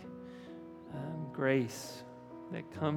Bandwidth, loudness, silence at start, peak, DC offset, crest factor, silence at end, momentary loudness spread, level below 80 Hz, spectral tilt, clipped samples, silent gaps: 18.5 kHz; -37 LUFS; 0 s; -16 dBFS; under 0.1%; 22 dB; 0 s; 18 LU; -74 dBFS; -6 dB/octave; under 0.1%; none